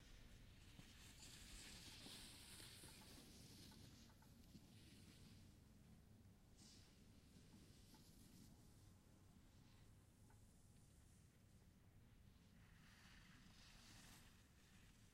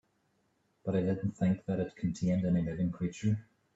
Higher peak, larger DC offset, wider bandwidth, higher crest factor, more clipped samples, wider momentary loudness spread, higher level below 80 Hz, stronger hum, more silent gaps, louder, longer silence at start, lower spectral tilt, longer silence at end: second, -44 dBFS vs -18 dBFS; neither; first, 16 kHz vs 7.8 kHz; first, 22 dB vs 14 dB; neither; first, 10 LU vs 5 LU; second, -72 dBFS vs -60 dBFS; neither; neither; second, -64 LUFS vs -33 LUFS; second, 0 s vs 0.85 s; second, -3.5 dB/octave vs -8.5 dB/octave; second, 0 s vs 0.35 s